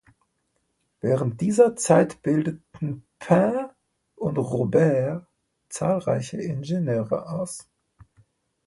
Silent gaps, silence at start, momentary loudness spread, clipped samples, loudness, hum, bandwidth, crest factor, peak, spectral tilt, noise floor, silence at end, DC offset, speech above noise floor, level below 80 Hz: none; 1.05 s; 13 LU; under 0.1%; -24 LUFS; none; 11.5 kHz; 20 dB; -4 dBFS; -7 dB/octave; -73 dBFS; 1.05 s; under 0.1%; 51 dB; -60 dBFS